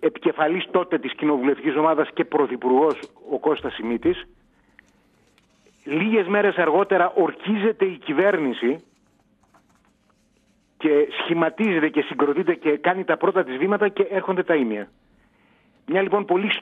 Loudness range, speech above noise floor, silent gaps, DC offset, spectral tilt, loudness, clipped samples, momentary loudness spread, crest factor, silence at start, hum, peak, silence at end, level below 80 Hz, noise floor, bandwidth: 5 LU; 42 dB; none; under 0.1%; -7.5 dB/octave; -22 LUFS; under 0.1%; 7 LU; 16 dB; 0 s; none; -6 dBFS; 0 s; -64 dBFS; -63 dBFS; 4.7 kHz